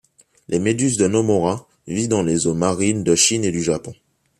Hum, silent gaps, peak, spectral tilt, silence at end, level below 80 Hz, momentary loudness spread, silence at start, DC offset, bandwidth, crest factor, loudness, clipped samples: none; none; -4 dBFS; -4.5 dB/octave; 0.45 s; -54 dBFS; 11 LU; 0.5 s; under 0.1%; 14 kHz; 16 dB; -19 LUFS; under 0.1%